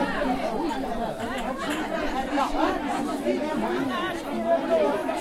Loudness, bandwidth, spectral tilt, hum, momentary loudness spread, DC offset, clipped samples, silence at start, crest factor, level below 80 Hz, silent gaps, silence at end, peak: -27 LUFS; 16 kHz; -5 dB/octave; none; 6 LU; under 0.1%; under 0.1%; 0 s; 16 dB; -44 dBFS; none; 0 s; -10 dBFS